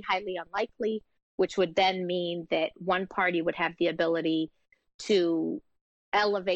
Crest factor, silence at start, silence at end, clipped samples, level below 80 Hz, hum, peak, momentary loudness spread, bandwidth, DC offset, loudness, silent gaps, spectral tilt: 14 dB; 0 s; 0 s; under 0.1%; -68 dBFS; none; -14 dBFS; 8 LU; 8.4 kHz; under 0.1%; -29 LUFS; 1.23-1.38 s, 4.94-4.99 s, 5.81-6.12 s; -5 dB/octave